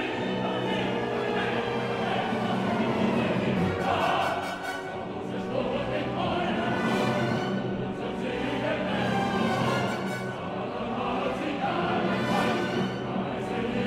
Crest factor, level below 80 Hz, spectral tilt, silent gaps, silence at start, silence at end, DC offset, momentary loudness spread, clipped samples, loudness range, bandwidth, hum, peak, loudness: 16 dB; -54 dBFS; -6 dB/octave; none; 0 s; 0 s; under 0.1%; 6 LU; under 0.1%; 2 LU; 15 kHz; none; -12 dBFS; -28 LUFS